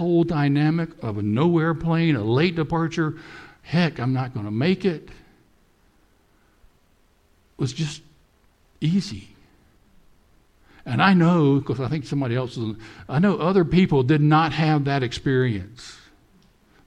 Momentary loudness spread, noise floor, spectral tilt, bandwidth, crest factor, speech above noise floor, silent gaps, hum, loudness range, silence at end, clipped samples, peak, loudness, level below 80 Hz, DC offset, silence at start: 15 LU; -60 dBFS; -7.5 dB/octave; 9.4 kHz; 20 dB; 39 dB; none; none; 11 LU; 0.9 s; under 0.1%; -4 dBFS; -22 LUFS; -50 dBFS; under 0.1%; 0 s